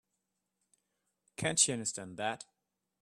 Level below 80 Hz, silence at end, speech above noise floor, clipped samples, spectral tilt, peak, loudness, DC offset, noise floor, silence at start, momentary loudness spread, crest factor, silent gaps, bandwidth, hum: -72 dBFS; 0.6 s; 51 dB; under 0.1%; -2 dB/octave; -10 dBFS; -32 LUFS; under 0.1%; -85 dBFS; 1.4 s; 16 LU; 28 dB; none; 14 kHz; none